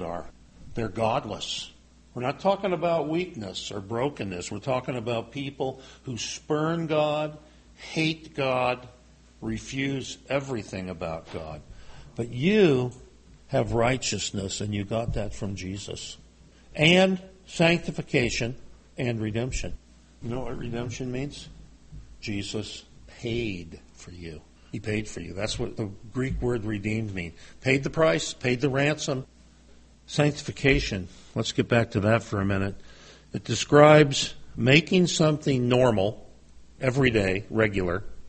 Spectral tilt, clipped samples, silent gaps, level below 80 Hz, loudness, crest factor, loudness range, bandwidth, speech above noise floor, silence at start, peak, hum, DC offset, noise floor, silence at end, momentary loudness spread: -5 dB/octave; under 0.1%; none; -46 dBFS; -26 LUFS; 22 dB; 12 LU; 8.8 kHz; 27 dB; 0 s; -4 dBFS; none; under 0.1%; -53 dBFS; 0 s; 17 LU